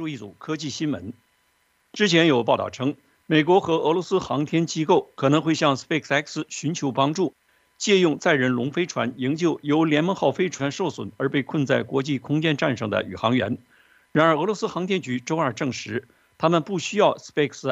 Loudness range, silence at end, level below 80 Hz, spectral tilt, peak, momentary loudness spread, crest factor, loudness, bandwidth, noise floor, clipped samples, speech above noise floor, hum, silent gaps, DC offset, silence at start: 3 LU; 0 s; -66 dBFS; -5 dB/octave; -4 dBFS; 9 LU; 20 dB; -23 LUFS; 8.2 kHz; -66 dBFS; under 0.1%; 44 dB; none; none; under 0.1%; 0 s